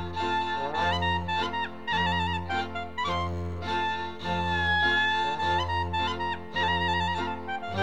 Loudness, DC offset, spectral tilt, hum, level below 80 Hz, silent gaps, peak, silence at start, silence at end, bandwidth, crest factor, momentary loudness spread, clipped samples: -28 LUFS; 0.7%; -5 dB/octave; none; -46 dBFS; none; -14 dBFS; 0 s; 0 s; 9.4 kHz; 14 dB; 8 LU; under 0.1%